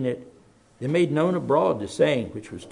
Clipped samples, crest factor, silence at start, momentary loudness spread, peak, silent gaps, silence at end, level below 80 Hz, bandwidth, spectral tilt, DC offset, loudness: under 0.1%; 16 dB; 0 s; 13 LU; -8 dBFS; none; 0 s; -62 dBFS; 11 kHz; -6.5 dB/octave; under 0.1%; -23 LUFS